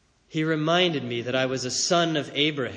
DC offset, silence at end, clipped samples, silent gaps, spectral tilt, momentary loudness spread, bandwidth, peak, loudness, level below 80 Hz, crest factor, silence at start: under 0.1%; 0 s; under 0.1%; none; -3.5 dB/octave; 7 LU; 10 kHz; -8 dBFS; -24 LUFS; -66 dBFS; 16 dB; 0.3 s